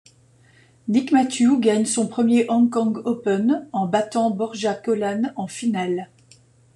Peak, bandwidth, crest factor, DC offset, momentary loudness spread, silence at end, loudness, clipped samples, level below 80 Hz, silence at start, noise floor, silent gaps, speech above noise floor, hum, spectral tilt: -6 dBFS; 11 kHz; 16 dB; under 0.1%; 8 LU; 0.7 s; -21 LUFS; under 0.1%; -66 dBFS; 0.85 s; -54 dBFS; none; 34 dB; none; -5 dB/octave